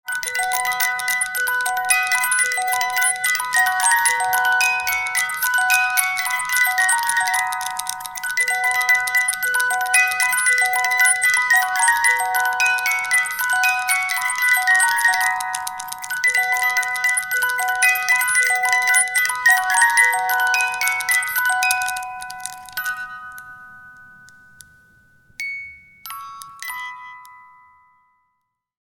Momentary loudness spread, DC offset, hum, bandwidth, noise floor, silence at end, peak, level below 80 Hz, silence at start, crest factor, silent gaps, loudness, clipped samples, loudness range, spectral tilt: 14 LU; under 0.1%; none; 19 kHz; -74 dBFS; 1.5 s; 0 dBFS; -62 dBFS; 0.05 s; 20 dB; none; -17 LUFS; under 0.1%; 17 LU; 3 dB/octave